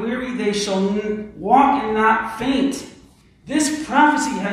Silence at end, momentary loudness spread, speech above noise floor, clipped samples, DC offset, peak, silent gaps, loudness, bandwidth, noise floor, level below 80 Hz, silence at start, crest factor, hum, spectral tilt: 0 s; 9 LU; 31 dB; under 0.1%; under 0.1%; -2 dBFS; none; -19 LUFS; 14 kHz; -49 dBFS; -50 dBFS; 0 s; 18 dB; none; -4 dB/octave